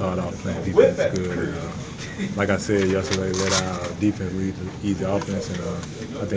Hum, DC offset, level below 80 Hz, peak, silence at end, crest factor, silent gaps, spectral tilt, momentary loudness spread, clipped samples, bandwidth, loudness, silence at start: none; under 0.1%; -42 dBFS; -2 dBFS; 0 s; 22 dB; none; -5 dB/octave; 12 LU; under 0.1%; 8 kHz; -24 LUFS; 0 s